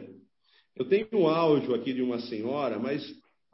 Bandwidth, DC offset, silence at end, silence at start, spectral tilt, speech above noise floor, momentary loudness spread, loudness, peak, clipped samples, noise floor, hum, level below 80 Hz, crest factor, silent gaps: 5.8 kHz; under 0.1%; 0.4 s; 0 s; -10 dB/octave; 40 dB; 10 LU; -28 LUFS; -12 dBFS; under 0.1%; -68 dBFS; none; -72 dBFS; 16 dB; none